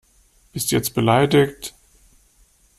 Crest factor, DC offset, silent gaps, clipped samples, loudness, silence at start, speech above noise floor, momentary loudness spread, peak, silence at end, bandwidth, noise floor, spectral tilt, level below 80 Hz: 20 dB; under 0.1%; none; under 0.1%; -19 LUFS; 0.55 s; 39 dB; 20 LU; -2 dBFS; 1.1 s; 16 kHz; -57 dBFS; -5 dB/octave; -52 dBFS